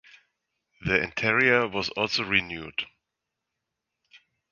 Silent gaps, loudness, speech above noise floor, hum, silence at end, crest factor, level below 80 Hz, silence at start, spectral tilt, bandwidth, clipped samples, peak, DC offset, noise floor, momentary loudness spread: none; -25 LUFS; 59 dB; none; 0.35 s; 26 dB; -56 dBFS; 0.8 s; -4.5 dB/octave; 7.2 kHz; under 0.1%; -4 dBFS; under 0.1%; -85 dBFS; 13 LU